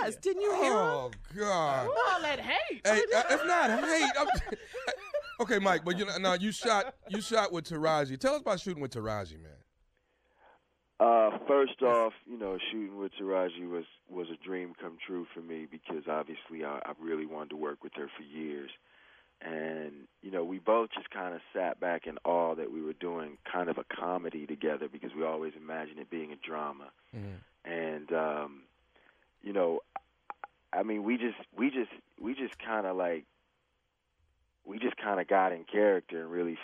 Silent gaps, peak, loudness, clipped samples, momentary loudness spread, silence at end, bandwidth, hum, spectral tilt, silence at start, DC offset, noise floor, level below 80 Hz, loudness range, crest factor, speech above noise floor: none; -12 dBFS; -32 LUFS; under 0.1%; 15 LU; 0 s; 14 kHz; none; -4 dB/octave; 0 s; under 0.1%; -79 dBFS; -60 dBFS; 10 LU; 22 dB; 46 dB